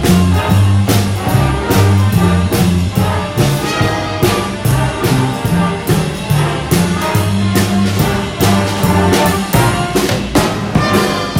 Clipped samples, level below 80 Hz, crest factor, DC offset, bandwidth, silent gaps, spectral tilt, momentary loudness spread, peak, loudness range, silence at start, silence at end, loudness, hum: under 0.1%; -28 dBFS; 12 dB; under 0.1%; 16.5 kHz; none; -5.5 dB/octave; 4 LU; 0 dBFS; 2 LU; 0 s; 0 s; -13 LUFS; none